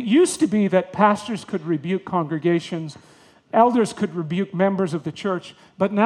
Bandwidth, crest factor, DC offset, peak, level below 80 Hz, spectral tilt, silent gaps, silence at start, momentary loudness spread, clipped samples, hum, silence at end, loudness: 12.5 kHz; 18 dB; under 0.1%; -2 dBFS; -66 dBFS; -6 dB/octave; none; 0 s; 10 LU; under 0.1%; none; 0 s; -22 LUFS